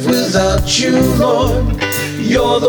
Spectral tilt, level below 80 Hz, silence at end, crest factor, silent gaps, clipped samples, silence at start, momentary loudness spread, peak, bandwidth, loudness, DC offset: -4.5 dB/octave; -24 dBFS; 0 s; 12 dB; none; under 0.1%; 0 s; 5 LU; -2 dBFS; over 20 kHz; -14 LUFS; under 0.1%